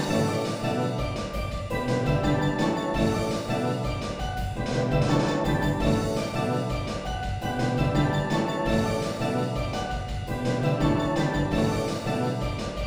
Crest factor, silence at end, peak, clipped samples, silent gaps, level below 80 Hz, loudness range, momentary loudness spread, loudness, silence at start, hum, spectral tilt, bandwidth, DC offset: 16 dB; 0 s; -10 dBFS; under 0.1%; none; -38 dBFS; 1 LU; 7 LU; -27 LUFS; 0 s; none; -6.5 dB/octave; over 20 kHz; under 0.1%